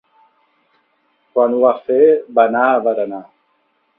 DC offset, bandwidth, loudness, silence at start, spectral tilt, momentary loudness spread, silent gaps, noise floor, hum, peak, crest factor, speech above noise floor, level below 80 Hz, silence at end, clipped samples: under 0.1%; 3.9 kHz; -15 LUFS; 1.35 s; -9.5 dB/octave; 10 LU; none; -63 dBFS; none; 0 dBFS; 16 dB; 49 dB; -66 dBFS; 0.75 s; under 0.1%